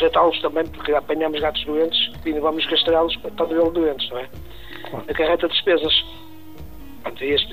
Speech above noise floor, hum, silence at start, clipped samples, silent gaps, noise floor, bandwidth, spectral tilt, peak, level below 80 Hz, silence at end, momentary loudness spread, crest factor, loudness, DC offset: 19 dB; none; 0 s; under 0.1%; none; -40 dBFS; 15.5 kHz; -5.5 dB/octave; -6 dBFS; -44 dBFS; 0 s; 20 LU; 16 dB; -20 LUFS; 1%